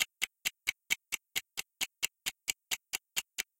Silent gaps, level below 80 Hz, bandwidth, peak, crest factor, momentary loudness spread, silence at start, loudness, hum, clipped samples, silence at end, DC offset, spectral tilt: none; -74 dBFS; 17 kHz; -12 dBFS; 28 dB; 4 LU; 0 s; -36 LUFS; none; under 0.1%; 0.15 s; under 0.1%; 2.5 dB/octave